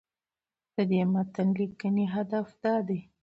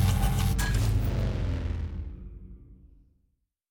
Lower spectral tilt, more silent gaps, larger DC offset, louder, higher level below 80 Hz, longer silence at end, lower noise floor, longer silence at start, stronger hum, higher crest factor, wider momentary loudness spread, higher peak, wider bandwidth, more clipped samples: first, -9.5 dB/octave vs -5.5 dB/octave; neither; neither; about the same, -29 LUFS vs -29 LUFS; second, -70 dBFS vs -32 dBFS; second, 0.2 s vs 0.85 s; first, under -90 dBFS vs -74 dBFS; first, 0.8 s vs 0 s; neither; about the same, 14 dB vs 14 dB; second, 6 LU vs 19 LU; about the same, -16 dBFS vs -14 dBFS; second, 5.4 kHz vs 19 kHz; neither